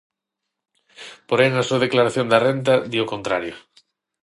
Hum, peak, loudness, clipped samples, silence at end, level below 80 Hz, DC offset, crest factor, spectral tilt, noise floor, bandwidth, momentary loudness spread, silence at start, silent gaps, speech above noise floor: none; -2 dBFS; -19 LUFS; under 0.1%; 0.65 s; -62 dBFS; under 0.1%; 20 dB; -5.5 dB/octave; -82 dBFS; 11.5 kHz; 18 LU; 1 s; none; 63 dB